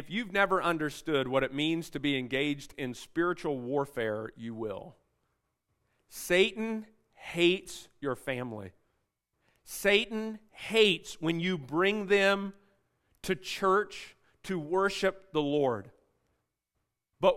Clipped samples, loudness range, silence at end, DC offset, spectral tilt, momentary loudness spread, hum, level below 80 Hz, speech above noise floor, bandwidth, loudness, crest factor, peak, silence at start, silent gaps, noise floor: under 0.1%; 6 LU; 0 s; under 0.1%; -4.5 dB/octave; 15 LU; none; -62 dBFS; 53 dB; 16 kHz; -30 LUFS; 22 dB; -10 dBFS; 0 s; none; -83 dBFS